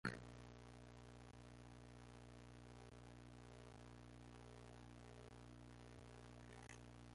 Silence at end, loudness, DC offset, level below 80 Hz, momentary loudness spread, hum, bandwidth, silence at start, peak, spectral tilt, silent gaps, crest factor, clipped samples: 0 s; -61 LUFS; under 0.1%; -68 dBFS; 2 LU; 60 Hz at -65 dBFS; 11.5 kHz; 0.05 s; -28 dBFS; -5.5 dB/octave; none; 30 dB; under 0.1%